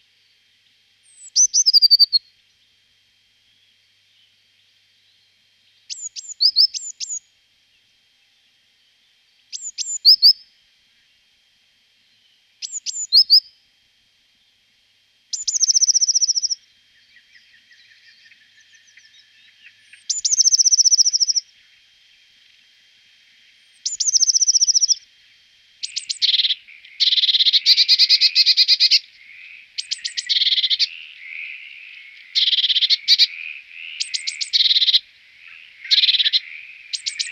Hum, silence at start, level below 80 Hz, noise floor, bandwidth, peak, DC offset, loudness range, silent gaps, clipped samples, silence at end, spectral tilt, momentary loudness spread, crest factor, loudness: none; 1.25 s; -80 dBFS; -60 dBFS; 16 kHz; -4 dBFS; under 0.1%; 8 LU; none; under 0.1%; 0 s; 8 dB/octave; 20 LU; 18 dB; -14 LUFS